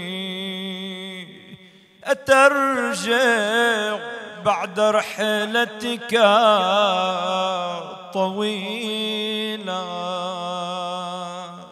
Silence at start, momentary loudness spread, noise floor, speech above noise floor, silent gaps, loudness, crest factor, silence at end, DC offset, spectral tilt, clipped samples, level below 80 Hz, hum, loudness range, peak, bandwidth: 0 s; 15 LU; -49 dBFS; 28 dB; none; -21 LUFS; 20 dB; 0 s; under 0.1%; -3.5 dB/octave; under 0.1%; -68 dBFS; none; 6 LU; -2 dBFS; 14.5 kHz